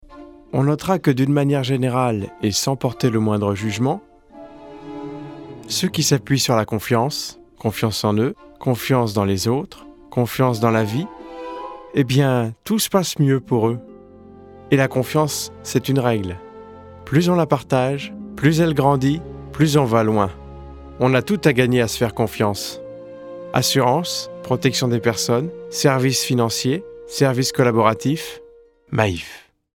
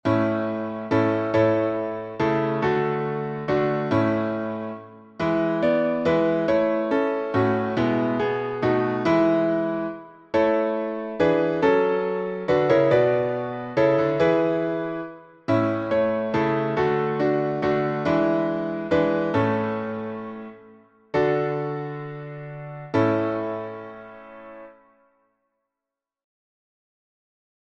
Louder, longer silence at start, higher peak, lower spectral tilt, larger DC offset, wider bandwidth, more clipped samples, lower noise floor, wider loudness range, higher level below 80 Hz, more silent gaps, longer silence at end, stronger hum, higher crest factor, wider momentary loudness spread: first, -19 LUFS vs -23 LUFS; about the same, 0.1 s vs 0.05 s; first, -2 dBFS vs -8 dBFS; second, -5.5 dB/octave vs -8 dB/octave; neither; first, 18 kHz vs 7.4 kHz; neither; second, -48 dBFS vs -87 dBFS; second, 3 LU vs 7 LU; first, -50 dBFS vs -58 dBFS; neither; second, 0.35 s vs 3 s; neither; about the same, 18 dB vs 16 dB; about the same, 16 LU vs 14 LU